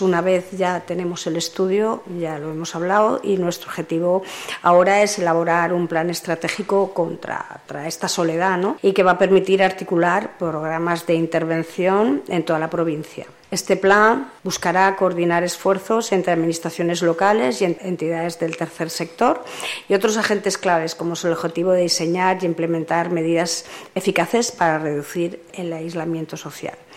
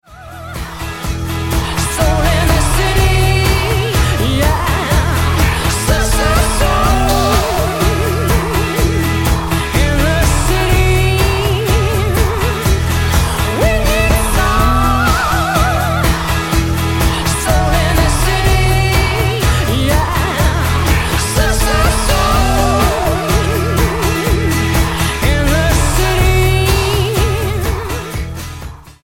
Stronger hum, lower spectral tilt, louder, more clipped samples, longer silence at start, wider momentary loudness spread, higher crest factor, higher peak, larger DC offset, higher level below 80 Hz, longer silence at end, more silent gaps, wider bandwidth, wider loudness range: neither; about the same, -4.5 dB/octave vs -4.5 dB/octave; second, -20 LUFS vs -14 LUFS; neither; about the same, 0 s vs 0.1 s; first, 11 LU vs 4 LU; first, 18 dB vs 12 dB; about the same, -2 dBFS vs 0 dBFS; neither; second, -64 dBFS vs -18 dBFS; about the same, 0 s vs 0.1 s; neither; about the same, 16.5 kHz vs 17 kHz; about the same, 3 LU vs 1 LU